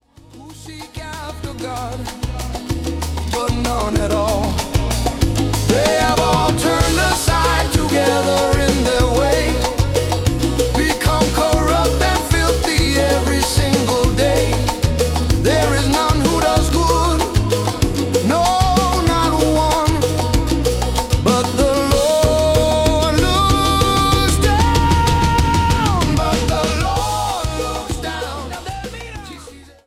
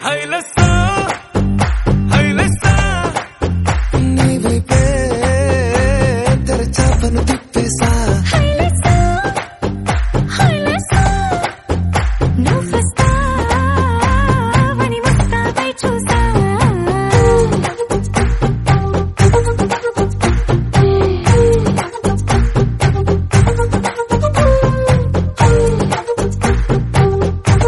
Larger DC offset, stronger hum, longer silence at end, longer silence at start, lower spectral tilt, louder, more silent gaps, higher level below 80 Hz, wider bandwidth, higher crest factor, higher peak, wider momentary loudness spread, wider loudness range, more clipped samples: neither; neither; first, 0.25 s vs 0 s; first, 0.35 s vs 0 s; about the same, -5 dB/octave vs -6 dB/octave; about the same, -16 LUFS vs -14 LUFS; neither; about the same, -24 dBFS vs -20 dBFS; first, 16.5 kHz vs 11.5 kHz; about the same, 12 dB vs 12 dB; second, -4 dBFS vs 0 dBFS; first, 11 LU vs 6 LU; first, 6 LU vs 1 LU; neither